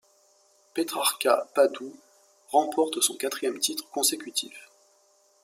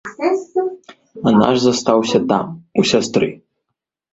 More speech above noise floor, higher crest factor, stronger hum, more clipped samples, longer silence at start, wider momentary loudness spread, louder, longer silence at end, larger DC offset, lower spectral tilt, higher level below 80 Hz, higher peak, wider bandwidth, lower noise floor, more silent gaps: second, 37 dB vs 64 dB; about the same, 22 dB vs 18 dB; neither; neither; first, 0.75 s vs 0.05 s; first, 13 LU vs 8 LU; second, -26 LUFS vs -17 LUFS; about the same, 0.8 s vs 0.8 s; neither; second, -0.5 dB/octave vs -5 dB/octave; second, -84 dBFS vs -54 dBFS; second, -8 dBFS vs 0 dBFS; first, 16 kHz vs 8.2 kHz; second, -64 dBFS vs -78 dBFS; neither